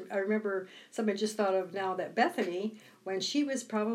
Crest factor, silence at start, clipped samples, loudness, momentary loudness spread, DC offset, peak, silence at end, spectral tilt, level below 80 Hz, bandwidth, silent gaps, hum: 18 dB; 0 s; under 0.1%; -33 LUFS; 8 LU; under 0.1%; -14 dBFS; 0 s; -4 dB/octave; under -90 dBFS; 14.5 kHz; none; none